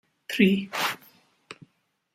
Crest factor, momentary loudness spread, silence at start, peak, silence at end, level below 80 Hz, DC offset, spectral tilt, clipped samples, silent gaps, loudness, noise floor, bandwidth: 22 dB; 25 LU; 0.3 s; -6 dBFS; 0.6 s; -68 dBFS; under 0.1%; -5 dB/octave; under 0.1%; none; -25 LUFS; -70 dBFS; 16 kHz